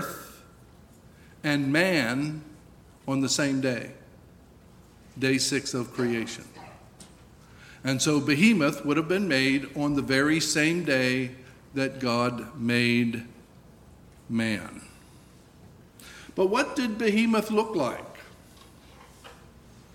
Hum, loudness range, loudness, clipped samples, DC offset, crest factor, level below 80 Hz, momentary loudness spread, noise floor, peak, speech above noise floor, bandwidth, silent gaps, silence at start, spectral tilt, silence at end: none; 7 LU; -26 LUFS; under 0.1%; under 0.1%; 20 dB; -58 dBFS; 18 LU; -53 dBFS; -8 dBFS; 27 dB; 17 kHz; none; 0 s; -4.5 dB/octave; 0.15 s